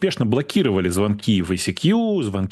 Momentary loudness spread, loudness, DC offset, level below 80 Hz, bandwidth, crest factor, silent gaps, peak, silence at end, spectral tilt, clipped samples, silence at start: 3 LU; -20 LUFS; under 0.1%; -50 dBFS; 12.5 kHz; 14 dB; none; -4 dBFS; 0 s; -6 dB/octave; under 0.1%; 0 s